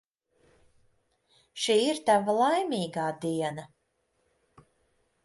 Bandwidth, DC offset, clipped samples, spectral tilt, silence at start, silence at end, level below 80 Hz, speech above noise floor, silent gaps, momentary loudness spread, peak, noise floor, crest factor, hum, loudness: 11.5 kHz; under 0.1%; under 0.1%; -4 dB/octave; 1.55 s; 1.6 s; -72 dBFS; 48 dB; none; 10 LU; -12 dBFS; -75 dBFS; 20 dB; none; -27 LUFS